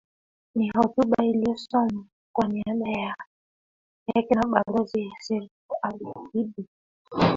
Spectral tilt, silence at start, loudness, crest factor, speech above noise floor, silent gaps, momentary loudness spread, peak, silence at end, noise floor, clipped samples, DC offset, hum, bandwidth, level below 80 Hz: -7 dB/octave; 0.55 s; -26 LUFS; 24 dB; over 65 dB; 2.12-2.34 s, 3.27-4.06 s, 5.51-5.69 s, 6.68-7.05 s; 14 LU; -4 dBFS; 0 s; under -90 dBFS; under 0.1%; under 0.1%; none; 7.6 kHz; -58 dBFS